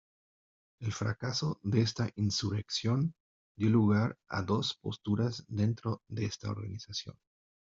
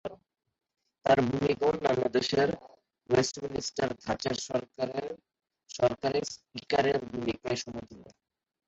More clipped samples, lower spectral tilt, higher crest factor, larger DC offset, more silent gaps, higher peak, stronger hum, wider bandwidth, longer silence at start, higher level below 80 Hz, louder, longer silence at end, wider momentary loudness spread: neither; first, -6 dB/octave vs -4.5 dB/octave; about the same, 18 dB vs 20 dB; neither; first, 3.20-3.55 s vs none; second, -16 dBFS vs -10 dBFS; neither; about the same, 7.6 kHz vs 8.2 kHz; first, 0.8 s vs 0.05 s; second, -66 dBFS vs -60 dBFS; second, -33 LUFS vs -30 LUFS; about the same, 0.55 s vs 0.6 s; second, 10 LU vs 15 LU